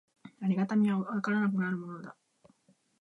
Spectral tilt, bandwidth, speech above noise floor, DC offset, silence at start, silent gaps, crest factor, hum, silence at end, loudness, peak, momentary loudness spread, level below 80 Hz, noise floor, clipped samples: -8.5 dB/octave; 6.6 kHz; 38 dB; under 0.1%; 0.25 s; none; 14 dB; none; 0.9 s; -31 LUFS; -18 dBFS; 16 LU; -80 dBFS; -68 dBFS; under 0.1%